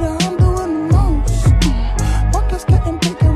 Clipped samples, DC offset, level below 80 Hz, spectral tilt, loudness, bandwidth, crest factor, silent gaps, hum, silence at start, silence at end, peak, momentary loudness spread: under 0.1%; under 0.1%; -16 dBFS; -6 dB/octave; -16 LUFS; 13.5 kHz; 12 dB; none; none; 0 s; 0 s; 0 dBFS; 4 LU